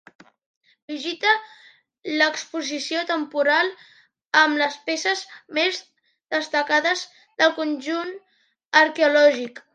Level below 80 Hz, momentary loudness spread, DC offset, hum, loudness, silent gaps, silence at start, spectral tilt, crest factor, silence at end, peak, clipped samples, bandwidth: -82 dBFS; 12 LU; under 0.1%; none; -21 LUFS; 8.65-8.71 s; 0.9 s; -1 dB/octave; 20 dB; 0.15 s; -2 dBFS; under 0.1%; 9.2 kHz